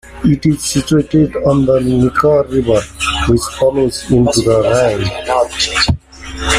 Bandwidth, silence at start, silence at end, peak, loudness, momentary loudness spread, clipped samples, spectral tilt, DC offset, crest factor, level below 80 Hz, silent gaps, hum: 15.5 kHz; 0.05 s; 0 s; 0 dBFS; -13 LUFS; 5 LU; under 0.1%; -5 dB/octave; under 0.1%; 12 dB; -30 dBFS; none; none